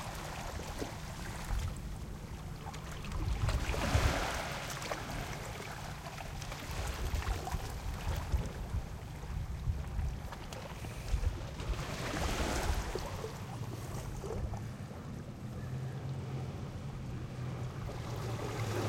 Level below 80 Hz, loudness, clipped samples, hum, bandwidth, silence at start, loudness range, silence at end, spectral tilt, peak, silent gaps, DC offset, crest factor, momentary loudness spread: -42 dBFS; -40 LUFS; under 0.1%; none; 16.5 kHz; 0 s; 5 LU; 0 s; -5 dB/octave; -16 dBFS; none; under 0.1%; 22 dB; 9 LU